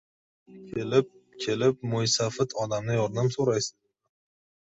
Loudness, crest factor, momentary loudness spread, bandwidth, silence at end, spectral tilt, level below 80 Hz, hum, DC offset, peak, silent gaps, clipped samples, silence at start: -27 LUFS; 22 dB; 9 LU; 8.2 kHz; 1 s; -4.5 dB/octave; -62 dBFS; none; under 0.1%; -8 dBFS; none; under 0.1%; 0.5 s